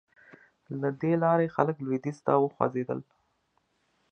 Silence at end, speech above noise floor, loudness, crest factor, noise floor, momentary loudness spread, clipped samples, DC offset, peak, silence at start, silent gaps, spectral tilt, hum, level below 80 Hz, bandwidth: 1.1 s; 46 dB; -28 LUFS; 24 dB; -73 dBFS; 10 LU; under 0.1%; under 0.1%; -6 dBFS; 0.7 s; none; -9.5 dB/octave; none; -72 dBFS; 8.8 kHz